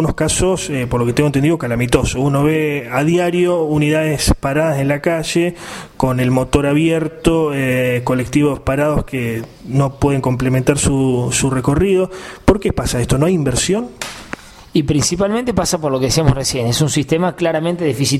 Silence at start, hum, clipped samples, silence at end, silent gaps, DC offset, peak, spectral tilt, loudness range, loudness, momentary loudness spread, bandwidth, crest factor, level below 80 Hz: 0 s; none; under 0.1%; 0 s; none; under 0.1%; 0 dBFS; -5.5 dB/octave; 2 LU; -16 LUFS; 5 LU; 16 kHz; 16 dB; -32 dBFS